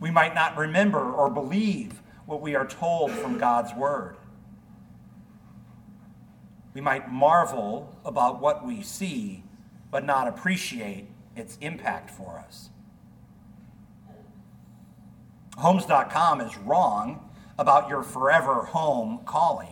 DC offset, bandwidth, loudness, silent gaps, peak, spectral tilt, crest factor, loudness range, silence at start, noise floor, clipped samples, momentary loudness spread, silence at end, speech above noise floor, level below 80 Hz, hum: under 0.1%; 19 kHz; -25 LUFS; none; -4 dBFS; -5.5 dB/octave; 22 dB; 14 LU; 0 s; -51 dBFS; under 0.1%; 21 LU; 0 s; 26 dB; -62 dBFS; none